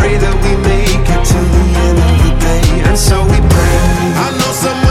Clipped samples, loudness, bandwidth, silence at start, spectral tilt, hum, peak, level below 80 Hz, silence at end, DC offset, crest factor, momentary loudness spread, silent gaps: under 0.1%; -11 LUFS; 15.5 kHz; 0 s; -5.5 dB/octave; none; 0 dBFS; -12 dBFS; 0 s; under 0.1%; 8 dB; 3 LU; none